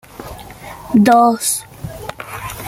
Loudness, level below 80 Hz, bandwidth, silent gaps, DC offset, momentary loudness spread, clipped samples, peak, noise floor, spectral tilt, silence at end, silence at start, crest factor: -13 LUFS; -44 dBFS; 17 kHz; none; under 0.1%; 23 LU; under 0.1%; -2 dBFS; -34 dBFS; -4.5 dB/octave; 0 s; 0.2 s; 16 dB